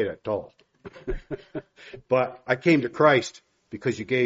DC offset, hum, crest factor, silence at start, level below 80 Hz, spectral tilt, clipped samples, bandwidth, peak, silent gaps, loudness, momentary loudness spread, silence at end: under 0.1%; none; 22 dB; 0 s; -46 dBFS; -4.5 dB/octave; under 0.1%; 7.6 kHz; -4 dBFS; none; -24 LUFS; 20 LU; 0 s